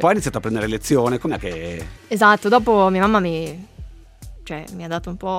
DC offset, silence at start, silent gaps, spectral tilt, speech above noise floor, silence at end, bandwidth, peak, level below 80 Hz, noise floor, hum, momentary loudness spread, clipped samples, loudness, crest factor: under 0.1%; 0 s; none; -5.5 dB/octave; 20 dB; 0 s; 16 kHz; -2 dBFS; -40 dBFS; -39 dBFS; none; 18 LU; under 0.1%; -19 LUFS; 18 dB